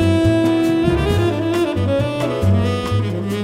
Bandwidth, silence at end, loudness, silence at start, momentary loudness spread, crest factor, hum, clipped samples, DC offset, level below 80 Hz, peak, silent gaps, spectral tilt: 15 kHz; 0 s; -17 LUFS; 0 s; 5 LU; 12 dB; none; under 0.1%; under 0.1%; -34 dBFS; -4 dBFS; none; -7 dB/octave